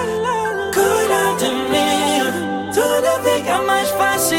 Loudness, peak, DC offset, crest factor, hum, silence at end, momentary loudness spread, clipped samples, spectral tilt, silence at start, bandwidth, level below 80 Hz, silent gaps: -17 LUFS; -4 dBFS; under 0.1%; 14 dB; none; 0 s; 4 LU; under 0.1%; -3 dB/octave; 0 s; 17 kHz; -52 dBFS; none